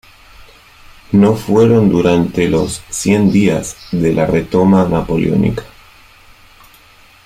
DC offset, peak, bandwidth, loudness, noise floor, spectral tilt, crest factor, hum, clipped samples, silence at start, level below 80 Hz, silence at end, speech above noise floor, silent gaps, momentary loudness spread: under 0.1%; -2 dBFS; 15 kHz; -13 LUFS; -44 dBFS; -6.5 dB/octave; 12 dB; none; under 0.1%; 0.4 s; -38 dBFS; 1.6 s; 32 dB; none; 8 LU